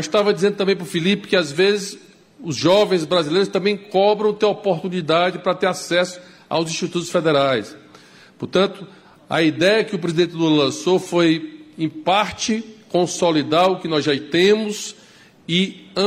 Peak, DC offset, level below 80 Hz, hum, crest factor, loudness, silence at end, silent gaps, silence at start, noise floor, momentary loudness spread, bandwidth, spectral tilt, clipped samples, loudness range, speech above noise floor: -4 dBFS; under 0.1%; -62 dBFS; none; 14 dB; -19 LUFS; 0 s; none; 0 s; -48 dBFS; 10 LU; 15.5 kHz; -4.5 dB/octave; under 0.1%; 3 LU; 30 dB